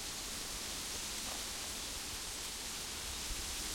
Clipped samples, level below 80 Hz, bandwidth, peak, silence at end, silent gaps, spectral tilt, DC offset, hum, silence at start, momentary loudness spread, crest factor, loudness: under 0.1%; -54 dBFS; 16.5 kHz; -28 dBFS; 0 s; none; -0.5 dB/octave; under 0.1%; none; 0 s; 1 LU; 14 dB; -40 LUFS